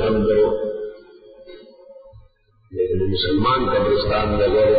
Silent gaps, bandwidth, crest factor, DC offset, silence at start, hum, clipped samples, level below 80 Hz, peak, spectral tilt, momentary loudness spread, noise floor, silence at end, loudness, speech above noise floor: none; 5 kHz; 12 dB; under 0.1%; 0 s; none; under 0.1%; -36 dBFS; -8 dBFS; -11 dB/octave; 11 LU; -54 dBFS; 0 s; -19 LUFS; 37 dB